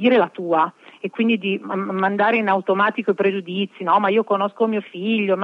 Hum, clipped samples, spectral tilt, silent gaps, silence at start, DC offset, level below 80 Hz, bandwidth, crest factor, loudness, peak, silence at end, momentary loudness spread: none; under 0.1%; -8 dB/octave; none; 0 s; under 0.1%; -90 dBFS; 5.4 kHz; 16 dB; -20 LUFS; -4 dBFS; 0 s; 7 LU